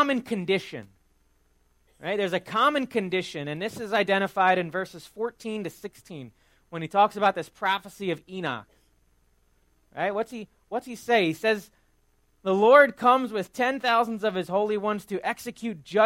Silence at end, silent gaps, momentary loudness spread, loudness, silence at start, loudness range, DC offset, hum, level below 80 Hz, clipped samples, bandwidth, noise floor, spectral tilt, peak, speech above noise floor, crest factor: 0 s; none; 15 LU; -25 LUFS; 0 s; 8 LU; under 0.1%; none; -66 dBFS; under 0.1%; 16 kHz; -65 dBFS; -5 dB/octave; -4 dBFS; 40 dB; 22 dB